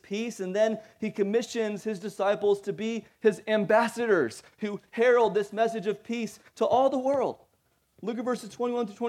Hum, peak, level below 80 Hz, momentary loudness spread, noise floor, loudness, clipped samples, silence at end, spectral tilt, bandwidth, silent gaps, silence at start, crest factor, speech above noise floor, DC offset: none; -10 dBFS; -76 dBFS; 11 LU; -70 dBFS; -28 LUFS; under 0.1%; 0 s; -5 dB/octave; 14.5 kHz; none; 0.1 s; 18 dB; 43 dB; under 0.1%